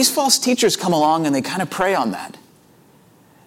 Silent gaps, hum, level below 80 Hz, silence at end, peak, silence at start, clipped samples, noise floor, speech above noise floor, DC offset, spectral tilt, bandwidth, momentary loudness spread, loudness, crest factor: none; none; -62 dBFS; 1.15 s; -2 dBFS; 0 s; under 0.1%; -51 dBFS; 33 dB; under 0.1%; -3 dB/octave; 17 kHz; 10 LU; -18 LUFS; 18 dB